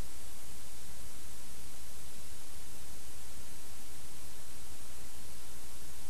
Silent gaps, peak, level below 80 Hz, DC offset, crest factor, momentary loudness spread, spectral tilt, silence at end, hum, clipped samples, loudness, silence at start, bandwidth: none; -24 dBFS; -56 dBFS; 5%; 14 dB; 0 LU; -3 dB/octave; 0 s; none; under 0.1%; -49 LUFS; 0 s; 13.5 kHz